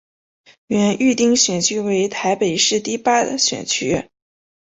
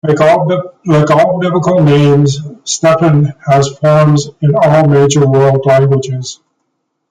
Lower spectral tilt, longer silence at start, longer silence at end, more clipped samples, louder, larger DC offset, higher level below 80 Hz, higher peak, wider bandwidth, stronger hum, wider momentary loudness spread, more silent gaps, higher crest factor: second, -3 dB/octave vs -6.5 dB/octave; first, 0.7 s vs 0.05 s; about the same, 0.75 s vs 0.75 s; neither; second, -17 LUFS vs -10 LUFS; neither; second, -54 dBFS vs -46 dBFS; about the same, -2 dBFS vs 0 dBFS; second, 8.4 kHz vs 9.4 kHz; neither; about the same, 6 LU vs 7 LU; neither; first, 16 dB vs 10 dB